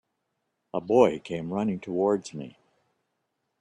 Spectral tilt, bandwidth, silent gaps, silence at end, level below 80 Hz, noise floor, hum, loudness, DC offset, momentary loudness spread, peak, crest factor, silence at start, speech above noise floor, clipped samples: -7 dB/octave; 10.5 kHz; none; 1.1 s; -66 dBFS; -79 dBFS; none; -26 LUFS; under 0.1%; 18 LU; -6 dBFS; 22 dB; 0.75 s; 53 dB; under 0.1%